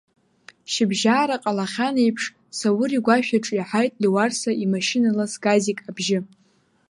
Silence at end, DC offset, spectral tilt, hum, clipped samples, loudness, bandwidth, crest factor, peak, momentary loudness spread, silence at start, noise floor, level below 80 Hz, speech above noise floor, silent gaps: 0.65 s; under 0.1%; -4.5 dB/octave; none; under 0.1%; -22 LUFS; 11.5 kHz; 20 dB; -2 dBFS; 7 LU; 0.7 s; -52 dBFS; -70 dBFS; 31 dB; none